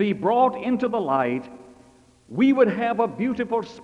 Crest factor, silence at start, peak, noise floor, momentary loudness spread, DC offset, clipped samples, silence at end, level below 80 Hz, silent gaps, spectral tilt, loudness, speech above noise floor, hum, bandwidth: 16 dB; 0 s; -6 dBFS; -54 dBFS; 8 LU; under 0.1%; under 0.1%; 0 s; -62 dBFS; none; -7.5 dB/octave; -22 LUFS; 32 dB; none; 7.8 kHz